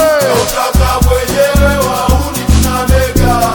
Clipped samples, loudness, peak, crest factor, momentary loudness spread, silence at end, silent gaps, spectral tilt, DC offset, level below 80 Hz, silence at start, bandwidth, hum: under 0.1%; -11 LUFS; 0 dBFS; 10 dB; 3 LU; 0 s; none; -5 dB/octave; under 0.1%; -14 dBFS; 0 s; 19.5 kHz; none